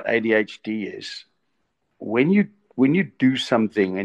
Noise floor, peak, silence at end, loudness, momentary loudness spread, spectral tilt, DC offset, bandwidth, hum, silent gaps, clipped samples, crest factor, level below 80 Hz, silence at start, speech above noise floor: -74 dBFS; -6 dBFS; 0 s; -21 LUFS; 15 LU; -6.5 dB/octave; under 0.1%; 9.8 kHz; none; none; under 0.1%; 16 dB; -70 dBFS; 0 s; 53 dB